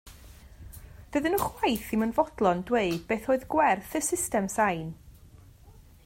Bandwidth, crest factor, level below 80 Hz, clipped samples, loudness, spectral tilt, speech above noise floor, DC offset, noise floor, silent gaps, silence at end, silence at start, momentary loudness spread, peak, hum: 16.5 kHz; 18 dB; -52 dBFS; under 0.1%; -27 LUFS; -4.5 dB/octave; 26 dB; under 0.1%; -53 dBFS; none; 0.35 s; 0.05 s; 19 LU; -10 dBFS; none